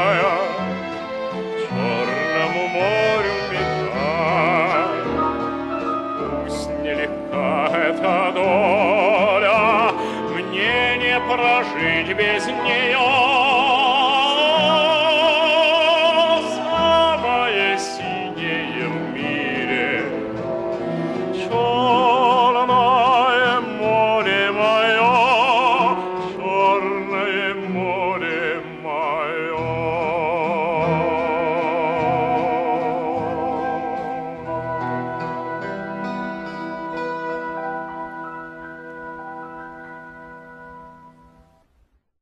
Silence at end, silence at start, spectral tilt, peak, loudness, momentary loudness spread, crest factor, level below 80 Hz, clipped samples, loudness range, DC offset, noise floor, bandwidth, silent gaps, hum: 1.15 s; 0 s; -5 dB/octave; -4 dBFS; -19 LUFS; 13 LU; 14 dB; -50 dBFS; under 0.1%; 12 LU; under 0.1%; -61 dBFS; 11.5 kHz; none; none